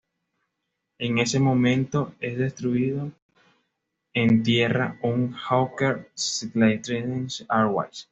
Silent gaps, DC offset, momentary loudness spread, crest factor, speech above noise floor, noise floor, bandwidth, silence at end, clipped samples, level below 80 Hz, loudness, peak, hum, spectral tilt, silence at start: 3.22-3.29 s; under 0.1%; 9 LU; 18 dB; 56 dB; -80 dBFS; 8 kHz; 0.1 s; under 0.1%; -60 dBFS; -24 LUFS; -6 dBFS; none; -5.5 dB/octave; 1 s